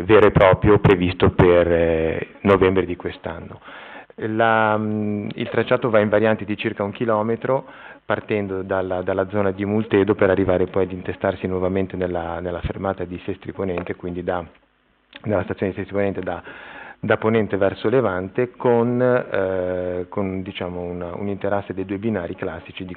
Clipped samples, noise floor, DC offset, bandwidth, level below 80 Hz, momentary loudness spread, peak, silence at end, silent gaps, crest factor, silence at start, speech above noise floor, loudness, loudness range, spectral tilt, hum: under 0.1%; -60 dBFS; under 0.1%; 4.5 kHz; -44 dBFS; 14 LU; -4 dBFS; 0 s; none; 18 dB; 0 s; 40 dB; -21 LUFS; 7 LU; -6 dB/octave; none